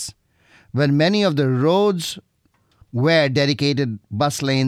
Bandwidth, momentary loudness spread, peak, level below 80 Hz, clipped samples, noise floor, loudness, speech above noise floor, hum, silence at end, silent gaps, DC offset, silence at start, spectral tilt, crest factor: 14.5 kHz; 12 LU; -4 dBFS; -60 dBFS; under 0.1%; -63 dBFS; -19 LUFS; 45 dB; none; 0 s; none; under 0.1%; 0 s; -5.5 dB/octave; 16 dB